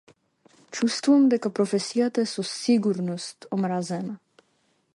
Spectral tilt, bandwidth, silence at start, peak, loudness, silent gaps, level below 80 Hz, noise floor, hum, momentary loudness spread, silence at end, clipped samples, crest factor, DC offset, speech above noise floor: -5.5 dB/octave; 11.5 kHz; 0.7 s; -10 dBFS; -24 LUFS; none; -74 dBFS; -69 dBFS; none; 14 LU; 0.8 s; under 0.1%; 16 dB; under 0.1%; 45 dB